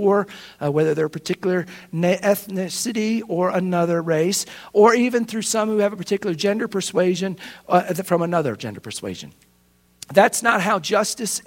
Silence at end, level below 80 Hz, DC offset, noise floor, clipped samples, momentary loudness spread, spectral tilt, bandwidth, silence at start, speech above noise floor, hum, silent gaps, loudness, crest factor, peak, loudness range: 0.05 s; -64 dBFS; under 0.1%; -59 dBFS; under 0.1%; 12 LU; -4.5 dB/octave; 16.5 kHz; 0 s; 38 dB; none; none; -21 LUFS; 20 dB; 0 dBFS; 3 LU